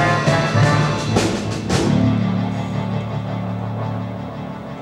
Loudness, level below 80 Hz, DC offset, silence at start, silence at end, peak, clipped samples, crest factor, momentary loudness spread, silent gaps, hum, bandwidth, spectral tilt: -20 LUFS; -42 dBFS; under 0.1%; 0 s; 0 s; -4 dBFS; under 0.1%; 16 dB; 12 LU; none; none; 12 kHz; -6 dB/octave